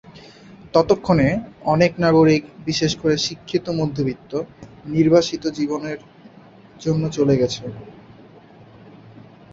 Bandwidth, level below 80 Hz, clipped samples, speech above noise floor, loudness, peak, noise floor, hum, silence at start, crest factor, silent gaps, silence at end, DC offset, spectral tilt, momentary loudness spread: 7.8 kHz; -48 dBFS; under 0.1%; 27 dB; -20 LUFS; -2 dBFS; -46 dBFS; none; 0.1 s; 20 dB; none; 0.65 s; under 0.1%; -6 dB/octave; 13 LU